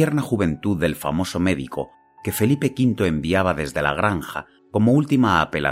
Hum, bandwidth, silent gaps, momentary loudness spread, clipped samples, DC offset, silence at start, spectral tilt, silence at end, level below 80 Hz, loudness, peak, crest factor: none; 16 kHz; none; 12 LU; under 0.1%; under 0.1%; 0 s; -6 dB/octave; 0 s; -44 dBFS; -21 LUFS; -4 dBFS; 16 dB